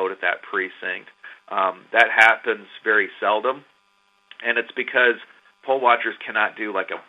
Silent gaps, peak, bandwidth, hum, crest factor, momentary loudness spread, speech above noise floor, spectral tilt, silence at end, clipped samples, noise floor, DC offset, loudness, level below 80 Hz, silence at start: none; 0 dBFS; 12 kHz; none; 22 dB; 14 LU; 42 dB; -3 dB/octave; 0.1 s; under 0.1%; -63 dBFS; under 0.1%; -20 LUFS; -78 dBFS; 0 s